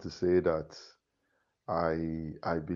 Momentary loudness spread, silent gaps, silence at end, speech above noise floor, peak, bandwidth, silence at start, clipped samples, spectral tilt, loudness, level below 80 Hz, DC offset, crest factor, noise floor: 19 LU; none; 0 s; 46 dB; -16 dBFS; 7.2 kHz; 0 s; under 0.1%; -7.5 dB/octave; -32 LUFS; -56 dBFS; under 0.1%; 18 dB; -78 dBFS